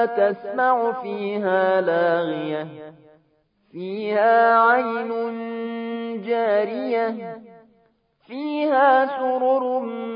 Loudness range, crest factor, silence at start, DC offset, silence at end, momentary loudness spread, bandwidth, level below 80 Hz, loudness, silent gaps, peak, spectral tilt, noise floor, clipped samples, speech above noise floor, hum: 5 LU; 16 dB; 0 s; under 0.1%; 0 s; 15 LU; 5.2 kHz; -80 dBFS; -21 LUFS; none; -6 dBFS; -10 dB/octave; -64 dBFS; under 0.1%; 43 dB; none